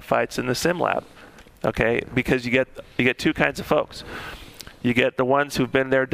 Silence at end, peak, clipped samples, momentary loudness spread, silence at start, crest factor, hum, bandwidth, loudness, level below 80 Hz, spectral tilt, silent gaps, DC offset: 0.05 s; -2 dBFS; under 0.1%; 13 LU; 0 s; 22 dB; none; 15.5 kHz; -22 LUFS; -46 dBFS; -5 dB/octave; none; under 0.1%